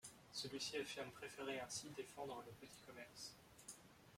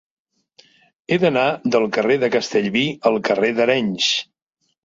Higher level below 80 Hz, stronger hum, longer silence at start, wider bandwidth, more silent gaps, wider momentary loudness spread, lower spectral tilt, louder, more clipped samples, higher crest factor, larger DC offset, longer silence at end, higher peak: second, -80 dBFS vs -62 dBFS; neither; second, 0 s vs 1.1 s; first, 16.5 kHz vs 7.8 kHz; neither; first, 13 LU vs 2 LU; second, -2.5 dB/octave vs -4.5 dB/octave; second, -51 LUFS vs -18 LUFS; neither; about the same, 18 dB vs 18 dB; neither; second, 0 s vs 0.6 s; second, -34 dBFS vs -2 dBFS